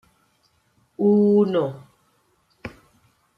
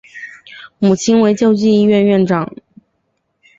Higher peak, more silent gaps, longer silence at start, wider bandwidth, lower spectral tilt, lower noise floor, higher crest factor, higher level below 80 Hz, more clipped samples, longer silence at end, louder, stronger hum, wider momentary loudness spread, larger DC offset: second, -8 dBFS vs -2 dBFS; neither; first, 1 s vs 0.15 s; second, 5.4 kHz vs 7.8 kHz; first, -9.5 dB/octave vs -6 dB/octave; about the same, -65 dBFS vs -67 dBFS; about the same, 16 dB vs 12 dB; second, -64 dBFS vs -54 dBFS; neither; second, 0.7 s vs 1.1 s; second, -20 LUFS vs -13 LUFS; neither; first, 24 LU vs 20 LU; neither